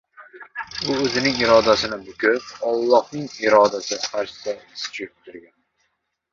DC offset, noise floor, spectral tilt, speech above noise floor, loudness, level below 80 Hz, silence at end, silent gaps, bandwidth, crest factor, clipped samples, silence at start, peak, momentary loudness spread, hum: under 0.1%; -73 dBFS; -3.5 dB/octave; 52 dB; -20 LUFS; -54 dBFS; 0.9 s; none; 7.6 kHz; 20 dB; under 0.1%; 0.2 s; -2 dBFS; 15 LU; none